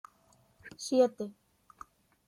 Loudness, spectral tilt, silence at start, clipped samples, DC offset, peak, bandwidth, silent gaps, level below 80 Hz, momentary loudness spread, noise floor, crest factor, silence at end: -31 LUFS; -4 dB/octave; 0.65 s; under 0.1%; under 0.1%; -14 dBFS; 13.5 kHz; none; -76 dBFS; 26 LU; -67 dBFS; 22 dB; 1 s